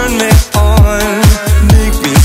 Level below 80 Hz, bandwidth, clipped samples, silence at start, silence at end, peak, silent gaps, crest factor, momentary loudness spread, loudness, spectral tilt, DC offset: -10 dBFS; 16.5 kHz; 2%; 0 s; 0 s; 0 dBFS; none; 8 dB; 2 LU; -9 LUFS; -5 dB/octave; under 0.1%